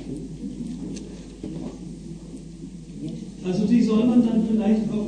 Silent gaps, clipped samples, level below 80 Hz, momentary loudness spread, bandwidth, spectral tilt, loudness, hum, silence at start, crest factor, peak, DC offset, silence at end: none; under 0.1%; -46 dBFS; 20 LU; 9.6 kHz; -7.5 dB/octave; -23 LUFS; none; 0 s; 16 dB; -8 dBFS; under 0.1%; 0 s